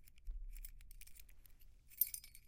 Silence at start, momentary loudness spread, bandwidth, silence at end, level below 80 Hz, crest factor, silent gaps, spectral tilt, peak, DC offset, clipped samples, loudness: 0 s; 22 LU; 17 kHz; 0 s; -54 dBFS; 30 dB; none; -0.5 dB/octave; -20 dBFS; under 0.1%; under 0.1%; -41 LUFS